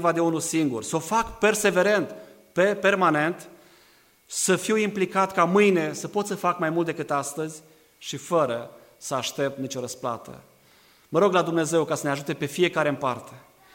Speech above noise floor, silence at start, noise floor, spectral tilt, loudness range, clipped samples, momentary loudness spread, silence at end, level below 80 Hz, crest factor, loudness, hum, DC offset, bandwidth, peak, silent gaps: 34 dB; 0 s; -58 dBFS; -4.5 dB/octave; 6 LU; under 0.1%; 14 LU; 0.35 s; -60 dBFS; 18 dB; -24 LUFS; none; under 0.1%; 16.5 kHz; -6 dBFS; none